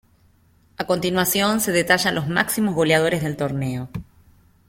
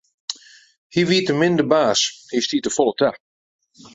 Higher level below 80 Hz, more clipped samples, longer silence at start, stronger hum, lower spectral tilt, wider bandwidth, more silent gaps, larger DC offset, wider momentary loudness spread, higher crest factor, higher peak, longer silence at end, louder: first, -52 dBFS vs -62 dBFS; neither; first, 0.8 s vs 0.3 s; neither; about the same, -4 dB/octave vs -4 dB/octave; first, 16.5 kHz vs 8 kHz; second, none vs 0.78-0.90 s; neither; second, 11 LU vs 15 LU; about the same, 20 dB vs 18 dB; about the same, -2 dBFS vs -2 dBFS; second, 0.65 s vs 0.8 s; about the same, -20 LUFS vs -19 LUFS